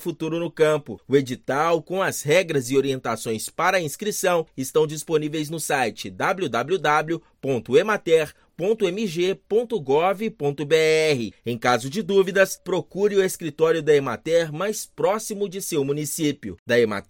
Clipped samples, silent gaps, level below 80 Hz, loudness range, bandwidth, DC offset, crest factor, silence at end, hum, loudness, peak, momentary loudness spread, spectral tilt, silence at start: under 0.1%; 16.59-16.66 s; -62 dBFS; 2 LU; 17 kHz; under 0.1%; 18 dB; 0.05 s; none; -23 LUFS; -4 dBFS; 7 LU; -4.5 dB/octave; 0 s